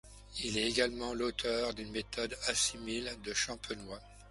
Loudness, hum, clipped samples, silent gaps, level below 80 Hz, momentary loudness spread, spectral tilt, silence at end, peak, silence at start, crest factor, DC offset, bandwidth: -35 LUFS; none; under 0.1%; none; -56 dBFS; 12 LU; -2 dB/octave; 0 s; -16 dBFS; 0.05 s; 22 dB; under 0.1%; 11.5 kHz